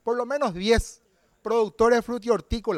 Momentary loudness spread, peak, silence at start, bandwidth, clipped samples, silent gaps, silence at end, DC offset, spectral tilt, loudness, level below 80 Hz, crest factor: 6 LU; -8 dBFS; 0.05 s; 13.5 kHz; under 0.1%; none; 0 s; under 0.1%; -5 dB/octave; -24 LUFS; -38 dBFS; 16 dB